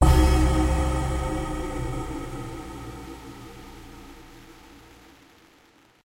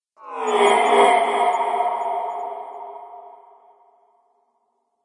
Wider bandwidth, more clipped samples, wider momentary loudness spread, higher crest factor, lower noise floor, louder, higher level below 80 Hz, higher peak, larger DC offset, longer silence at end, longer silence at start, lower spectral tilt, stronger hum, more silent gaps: first, 16 kHz vs 11 kHz; neither; first, 26 LU vs 21 LU; about the same, 20 dB vs 20 dB; second, -58 dBFS vs -70 dBFS; second, -26 LUFS vs -19 LUFS; first, -28 dBFS vs -80 dBFS; second, -6 dBFS vs -2 dBFS; neither; second, 1.3 s vs 1.75 s; second, 0 s vs 0.2 s; first, -6 dB/octave vs -1.5 dB/octave; neither; neither